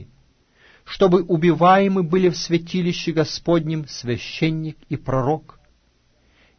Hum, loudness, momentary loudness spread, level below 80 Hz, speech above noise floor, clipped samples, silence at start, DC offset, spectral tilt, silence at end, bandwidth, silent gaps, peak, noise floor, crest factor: none; -20 LUFS; 12 LU; -46 dBFS; 41 dB; under 0.1%; 0 s; under 0.1%; -6.5 dB/octave; 1.2 s; 6.6 kHz; none; -4 dBFS; -61 dBFS; 18 dB